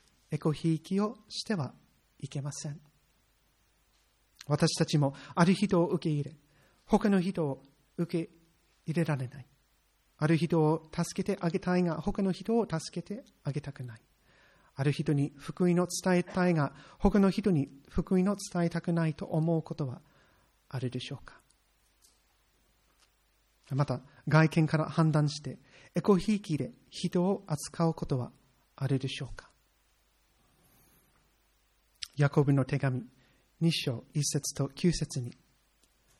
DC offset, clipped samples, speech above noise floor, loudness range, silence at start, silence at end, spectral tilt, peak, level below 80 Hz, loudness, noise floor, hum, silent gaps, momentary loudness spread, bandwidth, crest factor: under 0.1%; under 0.1%; 40 dB; 11 LU; 0.3 s; 0.9 s; -6 dB/octave; -10 dBFS; -54 dBFS; -31 LUFS; -70 dBFS; none; none; 15 LU; 13 kHz; 22 dB